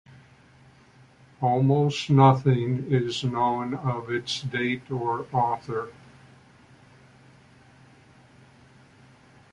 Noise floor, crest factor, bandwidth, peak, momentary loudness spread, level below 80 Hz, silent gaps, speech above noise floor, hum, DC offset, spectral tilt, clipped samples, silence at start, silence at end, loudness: -55 dBFS; 24 dB; 9.6 kHz; -4 dBFS; 11 LU; -62 dBFS; none; 31 dB; none; under 0.1%; -7 dB/octave; under 0.1%; 1.4 s; 3.6 s; -25 LUFS